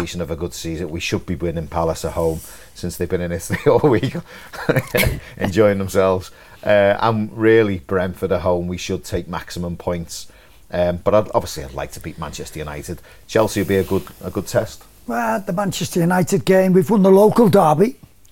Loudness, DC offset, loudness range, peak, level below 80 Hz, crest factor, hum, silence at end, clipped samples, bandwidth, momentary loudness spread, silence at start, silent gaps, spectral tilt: -19 LUFS; 0.5%; 7 LU; -2 dBFS; -40 dBFS; 18 dB; none; 0.35 s; under 0.1%; 17 kHz; 16 LU; 0 s; none; -6 dB/octave